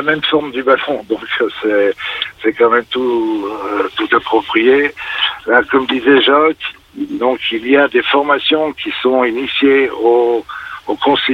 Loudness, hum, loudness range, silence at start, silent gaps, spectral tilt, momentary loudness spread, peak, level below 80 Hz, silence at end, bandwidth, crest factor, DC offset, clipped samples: -14 LUFS; none; 3 LU; 0 s; none; -5.5 dB/octave; 9 LU; -2 dBFS; -52 dBFS; 0 s; 6.8 kHz; 12 dB; under 0.1%; under 0.1%